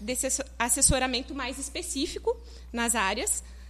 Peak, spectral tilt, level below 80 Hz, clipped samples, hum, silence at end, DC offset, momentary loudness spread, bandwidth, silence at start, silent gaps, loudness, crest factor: -6 dBFS; -2 dB/octave; -42 dBFS; under 0.1%; none; 0 s; under 0.1%; 12 LU; 13.5 kHz; 0 s; none; -27 LUFS; 22 dB